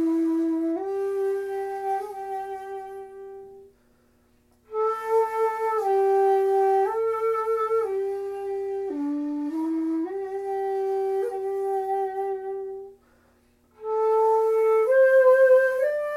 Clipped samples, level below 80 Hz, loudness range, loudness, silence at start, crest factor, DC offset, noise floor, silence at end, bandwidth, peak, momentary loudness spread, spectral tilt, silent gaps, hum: under 0.1%; -68 dBFS; 9 LU; -24 LUFS; 0 s; 16 dB; under 0.1%; -62 dBFS; 0 s; 14.5 kHz; -10 dBFS; 15 LU; -5 dB/octave; none; none